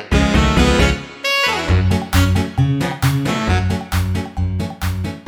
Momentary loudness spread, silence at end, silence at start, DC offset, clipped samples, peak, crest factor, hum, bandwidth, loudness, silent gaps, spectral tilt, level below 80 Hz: 8 LU; 0.05 s; 0 s; under 0.1%; under 0.1%; 0 dBFS; 16 dB; none; 18 kHz; -17 LUFS; none; -5.5 dB/octave; -24 dBFS